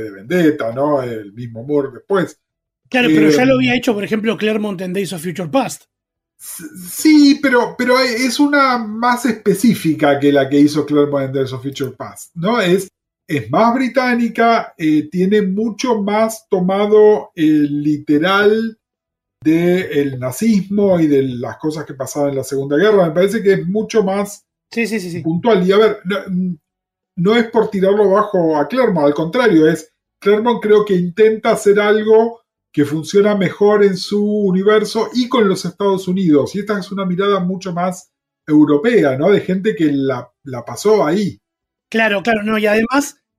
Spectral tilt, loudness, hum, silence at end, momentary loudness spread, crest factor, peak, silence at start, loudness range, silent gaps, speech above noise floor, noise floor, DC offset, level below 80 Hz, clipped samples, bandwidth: -6 dB/octave; -15 LUFS; none; 0.3 s; 11 LU; 12 dB; -2 dBFS; 0 s; 3 LU; none; 67 dB; -81 dBFS; under 0.1%; -58 dBFS; under 0.1%; 15.5 kHz